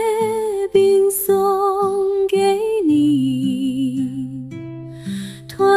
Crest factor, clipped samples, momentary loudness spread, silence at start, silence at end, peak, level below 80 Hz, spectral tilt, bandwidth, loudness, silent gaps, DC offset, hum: 14 dB; under 0.1%; 15 LU; 0 s; 0 s; -2 dBFS; -56 dBFS; -5.5 dB/octave; 16 kHz; -18 LUFS; none; under 0.1%; none